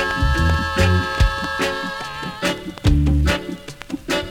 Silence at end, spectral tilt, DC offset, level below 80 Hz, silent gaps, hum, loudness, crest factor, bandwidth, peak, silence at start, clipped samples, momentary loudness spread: 0 s; -5.5 dB/octave; under 0.1%; -24 dBFS; none; none; -20 LUFS; 16 dB; 16.5 kHz; -4 dBFS; 0 s; under 0.1%; 11 LU